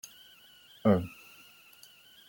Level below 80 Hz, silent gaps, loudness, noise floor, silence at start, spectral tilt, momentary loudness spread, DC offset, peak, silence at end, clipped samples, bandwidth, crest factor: -68 dBFS; none; -29 LUFS; -57 dBFS; 0.85 s; -7 dB/octave; 26 LU; under 0.1%; -10 dBFS; 1.2 s; under 0.1%; 17 kHz; 24 dB